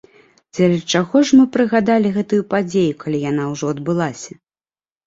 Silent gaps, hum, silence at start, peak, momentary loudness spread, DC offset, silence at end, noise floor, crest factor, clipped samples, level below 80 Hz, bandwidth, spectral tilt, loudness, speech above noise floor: none; none; 0.55 s; -2 dBFS; 10 LU; under 0.1%; 0.8 s; under -90 dBFS; 16 dB; under 0.1%; -56 dBFS; 7.8 kHz; -6 dB/octave; -17 LUFS; over 74 dB